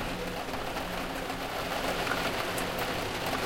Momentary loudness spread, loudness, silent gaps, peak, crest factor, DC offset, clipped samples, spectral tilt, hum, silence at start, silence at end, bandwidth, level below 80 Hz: 5 LU; -32 LUFS; none; -14 dBFS; 18 dB; under 0.1%; under 0.1%; -3.5 dB/octave; none; 0 s; 0 s; 17 kHz; -46 dBFS